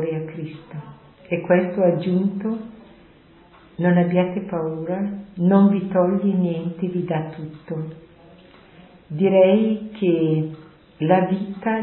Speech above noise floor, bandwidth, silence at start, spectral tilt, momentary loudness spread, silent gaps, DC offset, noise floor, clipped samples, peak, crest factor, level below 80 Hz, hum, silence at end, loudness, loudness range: 30 dB; 4.2 kHz; 0 s; -13 dB/octave; 18 LU; none; under 0.1%; -50 dBFS; under 0.1%; -2 dBFS; 20 dB; -60 dBFS; none; 0 s; -21 LUFS; 4 LU